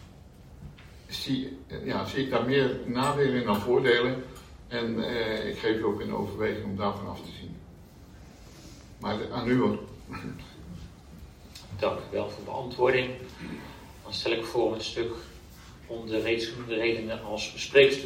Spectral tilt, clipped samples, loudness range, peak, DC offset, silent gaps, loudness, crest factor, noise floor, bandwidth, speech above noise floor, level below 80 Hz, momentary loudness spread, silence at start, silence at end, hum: -5.5 dB/octave; under 0.1%; 6 LU; -6 dBFS; under 0.1%; none; -29 LUFS; 24 dB; -50 dBFS; 16 kHz; 21 dB; -54 dBFS; 23 LU; 0 s; 0 s; none